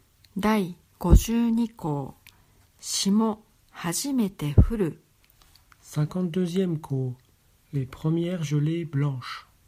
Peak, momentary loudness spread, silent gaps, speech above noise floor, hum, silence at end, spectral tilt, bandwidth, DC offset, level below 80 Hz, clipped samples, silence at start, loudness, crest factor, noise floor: -2 dBFS; 13 LU; none; 35 dB; none; 0.25 s; -6 dB/octave; 16 kHz; under 0.1%; -32 dBFS; under 0.1%; 0.35 s; -26 LUFS; 24 dB; -59 dBFS